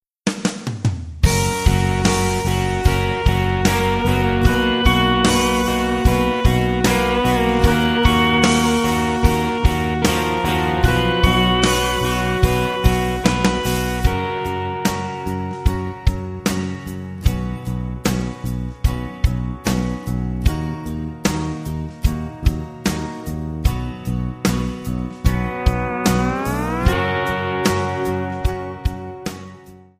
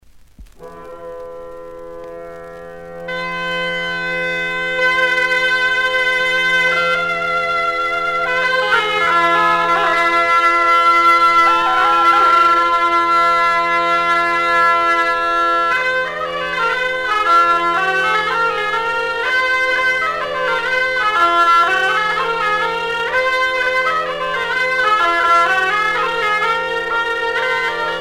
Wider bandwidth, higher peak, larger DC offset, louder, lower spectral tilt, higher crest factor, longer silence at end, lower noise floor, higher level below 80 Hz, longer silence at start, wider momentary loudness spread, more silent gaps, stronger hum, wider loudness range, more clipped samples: about the same, 15.5 kHz vs 16 kHz; about the same, 0 dBFS vs -2 dBFS; neither; second, -19 LUFS vs -14 LUFS; first, -5 dB/octave vs -2.5 dB/octave; about the same, 18 dB vs 14 dB; first, 0.25 s vs 0 s; about the same, -42 dBFS vs -41 dBFS; first, -26 dBFS vs -48 dBFS; second, 0.25 s vs 0.4 s; about the same, 10 LU vs 9 LU; neither; neither; about the same, 7 LU vs 6 LU; neither